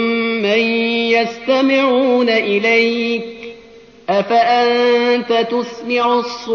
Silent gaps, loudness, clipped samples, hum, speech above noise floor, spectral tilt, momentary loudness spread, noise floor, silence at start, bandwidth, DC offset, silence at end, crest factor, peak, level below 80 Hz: none; -15 LUFS; under 0.1%; none; 27 dB; -1.5 dB/octave; 7 LU; -42 dBFS; 0 s; 6.8 kHz; under 0.1%; 0 s; 12 dB; -2 dBFS; -60 dBFS